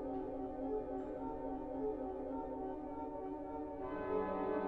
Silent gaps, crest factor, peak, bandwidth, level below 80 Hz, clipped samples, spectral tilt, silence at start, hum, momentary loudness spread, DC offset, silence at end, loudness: none; 16 dB; -26 dBFS; 4.7 kHz; -58 dBFS; under 0.1%; -9.5 dB/octave; 0 s; none; 6 LU; under 0.1%; 0 s; -43 LUFS